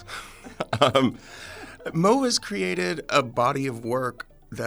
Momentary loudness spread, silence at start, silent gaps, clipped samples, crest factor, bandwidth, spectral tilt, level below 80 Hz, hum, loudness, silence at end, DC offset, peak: 19 LU; 0 s; none; under 0.1%; 22 dB; over 20 kHz; -4.5 dB/octave; -54 dBFS; none; -24 LUFS; 0 s; under 0.1%; -2 dBFS